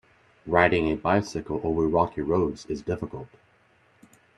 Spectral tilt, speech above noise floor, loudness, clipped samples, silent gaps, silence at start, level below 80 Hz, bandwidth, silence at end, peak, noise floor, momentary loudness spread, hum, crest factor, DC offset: -6.5 dB/octave; 37 dB; -25 LUFS; under 0.1%; none; 0.45 s; -50 dBFS; 11 kHz; 1.1 s; -4 dBFS; -62 dBFS; 12 LU; none; 24 dB; under 0.1%